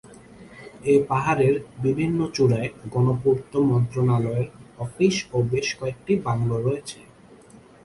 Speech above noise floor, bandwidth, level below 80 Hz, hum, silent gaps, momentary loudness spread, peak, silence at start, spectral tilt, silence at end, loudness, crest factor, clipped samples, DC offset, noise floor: 27 dB; 11.5 kHz; -52 dBFS; none; none; 12 LU; -6 dBFS; 0.05 s; -6.5 dB/octave; 0.8 s; -23 LUFS; 16 dB; under 0.1%; under 0.1%; -49 dBFS